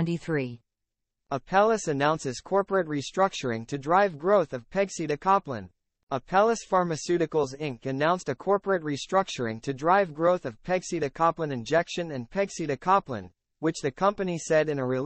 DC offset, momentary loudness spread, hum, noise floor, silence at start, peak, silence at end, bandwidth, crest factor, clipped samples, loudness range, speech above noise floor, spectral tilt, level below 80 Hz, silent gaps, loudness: under 0.1%; 8 LU; none; -84 dBFS; 0 s; -8 dBFS; 0 s; 8.4 kHz; 18 dB; under 0.1%; 2 LU; 58 dB; -5.5 dB/octave; -60 dBFS; 6.03-6.07 s; -27 LUFS